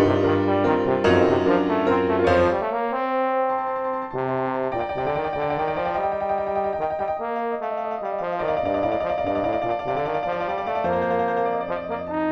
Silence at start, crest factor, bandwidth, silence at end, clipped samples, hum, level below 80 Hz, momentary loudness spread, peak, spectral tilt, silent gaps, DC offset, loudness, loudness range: 0 s; 18 dB; 8.4 kHz; 0 s; under 0.1%; none; -50 dBFS; 7 LU; -6 dBFS; -7.5 dB/octave; none; under 0.1%; -23 LUFS; 5 LU